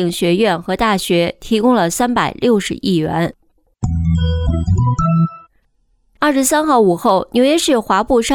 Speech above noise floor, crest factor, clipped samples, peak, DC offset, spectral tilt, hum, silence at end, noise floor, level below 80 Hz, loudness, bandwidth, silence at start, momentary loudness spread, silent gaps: 45 dB; 12 dB; under 0.1%; -2 dBFS; under 0.1%; -5.5 dB/octave; none; 0 s; -59 dBFS; -30 dBFS; -15 LUFS; 18 kHz; 0 s; 6 LU; none